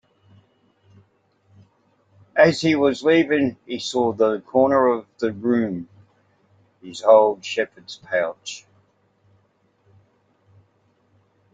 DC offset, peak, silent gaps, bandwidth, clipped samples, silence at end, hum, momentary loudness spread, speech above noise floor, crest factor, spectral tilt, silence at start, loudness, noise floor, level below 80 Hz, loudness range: under 0.1%; -2 dBFS; none; 9 kHz; under 0.1%; 2.95 s; none; 18 LU; 44 dB; 20 dB; -5.5 dB/octave; 2.35 s; -20 LUFS; -64 dBFS; -66 dBFS; 11 LU